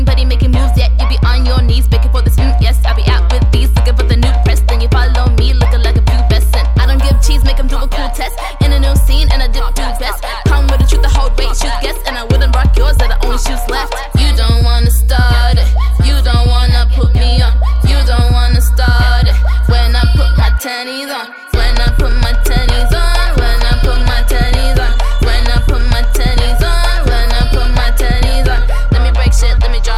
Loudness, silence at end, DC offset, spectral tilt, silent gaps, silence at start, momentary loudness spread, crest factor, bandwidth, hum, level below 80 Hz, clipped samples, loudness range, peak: -12 LUFS; 0 s; 3%; -5 dB/octave; none; 0 s; 6 LU; 8 dB; 15 kHz; none; -10 dBFS; under 0.1%; 3 LU; 0 dBFS